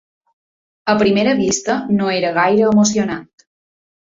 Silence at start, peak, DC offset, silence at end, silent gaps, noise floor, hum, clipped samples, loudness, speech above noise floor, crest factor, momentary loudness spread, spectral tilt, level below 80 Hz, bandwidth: 0.85 s; -2 dBFS; under 0.1%; 0.9 s; none; under -90 dBFS; none; under 0.1%; -16 LUFS; over 75 dB; 16 dB; 9 LU; -4.5 dB/octave; -54 dBFS; 7.8 kHz